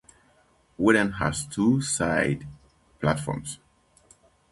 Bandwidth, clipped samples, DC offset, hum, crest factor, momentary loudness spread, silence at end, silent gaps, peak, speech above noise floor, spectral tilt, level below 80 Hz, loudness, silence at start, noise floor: 11.5 kHz; under 0.1%; under 0.1%; none; 22 dB; 14 LU; 0.95 s; none; -6 dBFS; 38 dB; -5 dB/octave; -50 dBFS; -25 LUFS; 0.8 s; -62 dBFS